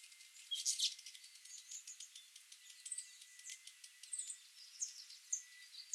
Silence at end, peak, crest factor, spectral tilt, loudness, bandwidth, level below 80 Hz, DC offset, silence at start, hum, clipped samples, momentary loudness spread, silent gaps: 0 s; -24 dBFS; 26 dB; 10 dB/octave; -45 LUFS; 16 kHz; under -90 dBFS; under 0.1%; 0 s; none; under 0.1%; 18 LU; none